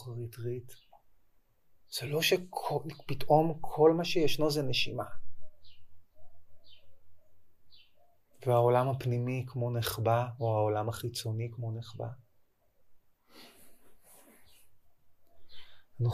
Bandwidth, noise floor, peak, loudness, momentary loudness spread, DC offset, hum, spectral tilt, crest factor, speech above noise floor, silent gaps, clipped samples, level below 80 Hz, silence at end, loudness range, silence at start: 15.5 kHz; -67 dBFS; -10 dBFS; -31 LUFS; 14 LU; under 0.1%; none; -5.5 dB/octave; 22 dB; 37 dB; none; under 0.1%; -60 dBFS; 0 s; 14 LU; 0 s